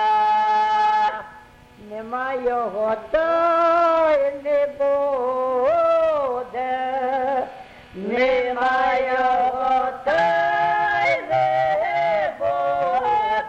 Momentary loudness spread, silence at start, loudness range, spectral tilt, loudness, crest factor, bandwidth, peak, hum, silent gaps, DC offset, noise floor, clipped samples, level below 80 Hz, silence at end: 8 LU; 0 s; 3 LU; -5 dB/octave; -20 LUFS; 12 dB; 8.6 kHz; -8 dBFS; none; none; under 0.1%; -46 dBFS; under 0.1%; -54 dBFS; 0 s